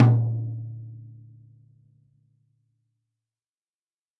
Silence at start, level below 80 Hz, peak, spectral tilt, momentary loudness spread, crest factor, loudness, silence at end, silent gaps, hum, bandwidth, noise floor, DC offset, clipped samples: 0 s; -70 dBFS; -4 dBFS; -10.5 dB/octave; 25 LU; 24 dB; -26 LUFS; 3.1 s; none; none; 3.3 kHz; under -90 dBFS; under 0.1%; under 0.1%